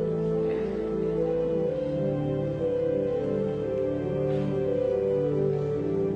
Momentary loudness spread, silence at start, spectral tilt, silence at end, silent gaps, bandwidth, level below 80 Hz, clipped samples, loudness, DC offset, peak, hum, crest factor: 3 LU; 0 s; -9.5 dB/octave; 0 s; none; 7.8 kHz; -50 dBFS; under 0.1%; -27 LUFS; under 0.1%; -16 dBFS; none; 10 dB